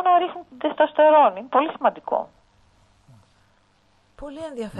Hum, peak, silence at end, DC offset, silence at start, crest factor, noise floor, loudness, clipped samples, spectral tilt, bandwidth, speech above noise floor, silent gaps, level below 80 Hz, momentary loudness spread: none; -4 dBFS; 0 s; under 0.1%; 0 s; 18 dB; -61 dBFS; -20 LUFS; under 0.1%; -6 dB/octave; 9 kHz; 41 dB; none; -58 dBFS; 21 LU